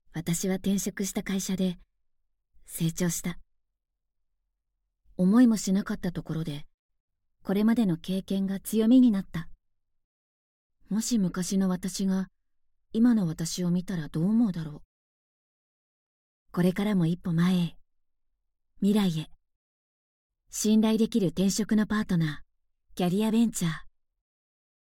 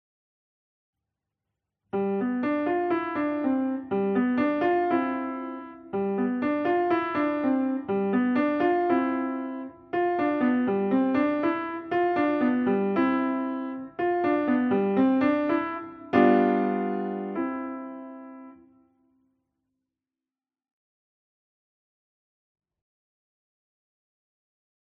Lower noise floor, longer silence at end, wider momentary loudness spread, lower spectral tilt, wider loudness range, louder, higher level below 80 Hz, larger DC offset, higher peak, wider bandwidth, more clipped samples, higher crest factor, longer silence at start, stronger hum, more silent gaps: second, -82 dBFS vs under -90 dBFS; second, 1 s vs 6.25 s; first, 14 LU vs 11 LU; second, -6 dB/octave vs -9.5 dB/octave; about the same, 5 LU vs 6 LU; about the same, -27 LUFS vs -26 LUFS; first, -54 dBFS vs -68 dBFS; neither; second, -12 dBFS vs -8 dBFS; first, 17 kHz vs 4.9 kHz; neither; about the same, 16 dB vs 20 dB; second, 0.15 s vs 1.95 s; neither; first, 6.74-6.89 s, 7.00-7.08 s, 10.04-10.70 s, 14.85-16.46 s, 19.56-20.30 s vs none